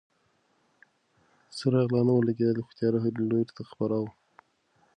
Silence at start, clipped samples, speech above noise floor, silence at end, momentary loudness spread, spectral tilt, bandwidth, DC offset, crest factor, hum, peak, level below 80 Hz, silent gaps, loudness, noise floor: 1.5 s; under 0.1%; 44 dB; 0.85 s; 10 LU; -8.5 dB/octave; 9.8 kHz; under 0.1%; 16 dB; none; -12 dBFS; -68 dBFS; none; -28 LUFS; -70 dBFS